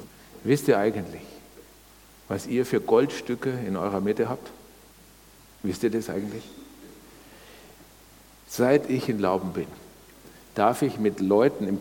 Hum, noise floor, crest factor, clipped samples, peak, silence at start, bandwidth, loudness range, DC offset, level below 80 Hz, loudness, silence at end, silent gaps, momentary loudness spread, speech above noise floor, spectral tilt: none; -52 dBFS; 22 dB; under 0.1%; -6 dBFS; 0 s; 19 kHz; 8 LU; under 0.1%; -60 dBFS; -26 LUFS; 0 s; none; 24 LU; 28 dB; -6 dB/octave